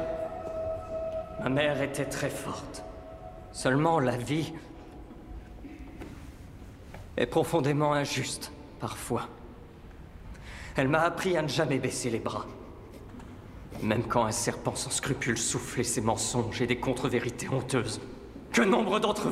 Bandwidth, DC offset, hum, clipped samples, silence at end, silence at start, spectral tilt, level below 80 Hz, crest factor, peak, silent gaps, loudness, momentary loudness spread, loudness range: 16 kHz; under 0.1%; none; under 0.1%; 0 s; 0 s; -4.5 dB/octave; -50 dBFS; 22 dB; -10 dBFS; none; -29 LUFS; 20 LU; 4 LU